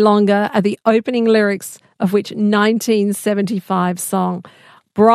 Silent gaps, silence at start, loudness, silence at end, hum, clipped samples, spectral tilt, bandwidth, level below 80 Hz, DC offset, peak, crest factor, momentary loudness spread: none; 0 s; -16 LUFS; 0 s; none; under 0.1%; -5.5 dB/octave; 14.5 kHz; -66 dBFS; under 0.1%; 0 dBFS; 16 dB; 8 LU